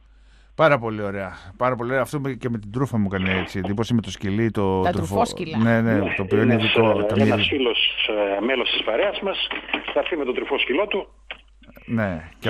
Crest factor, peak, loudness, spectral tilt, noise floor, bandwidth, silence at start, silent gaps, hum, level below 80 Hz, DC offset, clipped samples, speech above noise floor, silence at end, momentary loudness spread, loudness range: 18 dB; -4 dBFS; -22 LUFS; -6 dB/octave; -51 dBFS; 14 kHz; 0.6 s; none; none; -50 dBFS; under 0.1%; under 0.1%; 29 dB; 0 s; 9 LU; 5 LU